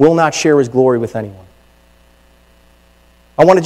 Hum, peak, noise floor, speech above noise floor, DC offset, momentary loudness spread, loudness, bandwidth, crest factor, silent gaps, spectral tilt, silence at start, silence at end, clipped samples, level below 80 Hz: 60 Hz at -50 dBFS; 0 dBFS; -49 dBFS; 38 dB; under 0.1%; 16 LU; -13 LUFS; 13 kHz; 14 dB; none; -5.5 dB/octave; 0 s; 0 s; 0.6%; -50 dBFS